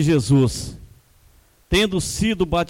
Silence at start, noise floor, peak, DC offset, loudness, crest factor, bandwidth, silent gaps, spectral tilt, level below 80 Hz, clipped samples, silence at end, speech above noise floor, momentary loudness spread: 0 s; -54 dBFS; -6 dBFS; under 0.1%; -20 LUFS; 14 dB; 16.5 kHz; none; -5.5 dB/octave; -36 dBFS; under 0.1%; 0.05 s; 35 dB; 10 LU